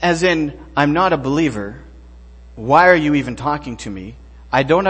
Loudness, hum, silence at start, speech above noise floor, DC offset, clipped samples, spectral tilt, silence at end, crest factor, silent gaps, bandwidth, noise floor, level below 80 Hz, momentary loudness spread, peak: -16 LUFS; none; 0 s; 24 dB; under 0.1%; under 0.1%; -6 dB/octave; 0 s; 18 dB; none; 8.8 kHz; -40 dBFS; -40 dBFS; 18 LU; 0 dBFS